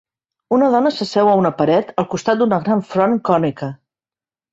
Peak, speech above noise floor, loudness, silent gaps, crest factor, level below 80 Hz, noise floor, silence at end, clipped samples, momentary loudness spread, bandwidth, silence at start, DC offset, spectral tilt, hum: -2 dBFS; over 74 dB; -16 LUFS; none; 16 dB; -58 dBFS; under -90 dBFS; 0.75 s; under 0.1%; 7 LU; 8 kHz; 0.5 s; under 0.1%; -6.5 dB/octave; none